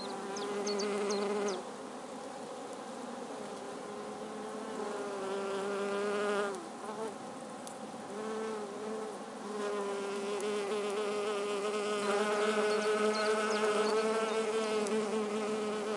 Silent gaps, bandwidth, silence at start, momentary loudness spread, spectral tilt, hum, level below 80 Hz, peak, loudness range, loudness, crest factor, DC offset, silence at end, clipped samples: none; 11.5 kHz; 0 s; 13 LU; -3.5 dB/octave; none; -84 dBFS; -18 dBFS; 10 LU; -35 LUFS; 16 dB; under 0.1%; 0 s; under 0.1%